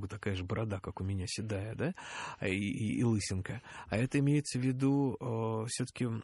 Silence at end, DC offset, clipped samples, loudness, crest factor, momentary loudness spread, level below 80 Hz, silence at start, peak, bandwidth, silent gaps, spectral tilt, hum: 0 s; under 0.1%; under 0.1%; -35 LUFS; 18 dB; 8 LU; -60 dBFS; 0 s; -16 dBFS; 11.5 kHz; none; -6 dB/octave; none